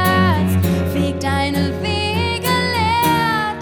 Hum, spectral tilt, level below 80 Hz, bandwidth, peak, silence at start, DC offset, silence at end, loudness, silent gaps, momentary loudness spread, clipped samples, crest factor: none; -5.5 dB/octave; -36 dBFS; 19 kHz; -4 dBFS; 0 s; under 0.1%; 0 s; -17 LUFS; none; 4 LU; under 0.1%; 14 dB